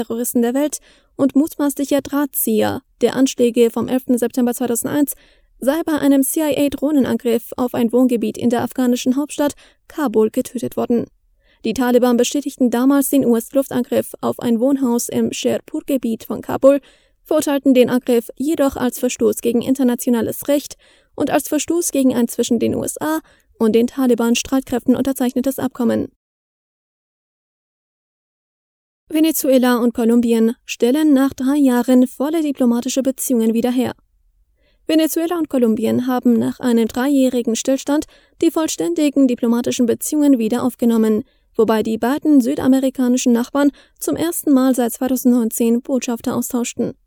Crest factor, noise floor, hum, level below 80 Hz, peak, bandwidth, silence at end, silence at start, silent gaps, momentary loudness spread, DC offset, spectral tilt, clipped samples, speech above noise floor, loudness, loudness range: 18 dB; -59 dBFS; none; -54 dBFS; 0 dBFS; over 20 kHz; 0.15 s; 0 s; 26.16-29.07 s; 7 LU; under 0.1%; -4.5 dB/octave; under 0.1%; 42 dB; -17 LUFS; 3 LU